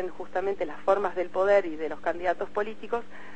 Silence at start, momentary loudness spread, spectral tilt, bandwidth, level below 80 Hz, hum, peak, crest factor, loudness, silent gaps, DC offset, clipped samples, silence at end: 0 s; 10 LU; -5.5 dB/octave; 8.4 kHz; -60 dBFS; none; -10 dBFS; 18 dB; -28 LUFS; none; 2%; under 0.1%; 0 s